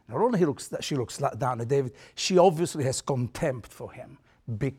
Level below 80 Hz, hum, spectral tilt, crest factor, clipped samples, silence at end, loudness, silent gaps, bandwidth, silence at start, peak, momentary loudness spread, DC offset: -58 dBFS; none; -5.5 dB/octave; 20 dB; under 0.1%; 0.05 s; -27 LUFS; none; 16 kHz; 0.1 s; -8 dBFS; 20 LU; under 0.1%